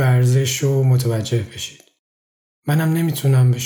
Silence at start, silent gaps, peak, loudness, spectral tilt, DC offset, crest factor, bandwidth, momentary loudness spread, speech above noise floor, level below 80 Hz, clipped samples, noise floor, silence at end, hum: 0 s; 1.99-2.63 s; -6 dBFS; -18 LUFS; -6 dB/octave; under 0.1%; 12 dB; 19.5 kHz; 14 LU; over 73 dB; -56 dBFS; under 0.1%; under -90 dBFS; 0 s; none